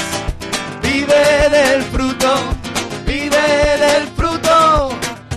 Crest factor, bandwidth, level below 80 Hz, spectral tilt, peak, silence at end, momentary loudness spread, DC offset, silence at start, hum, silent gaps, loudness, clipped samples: 12 dB; 13.5 kHz; -28 dBFS; -4 dB/octave; -4 dBFS; 0 s; 11 LU; under 0.1%; 0 s; none; none; -14 LUFS; under 0.1%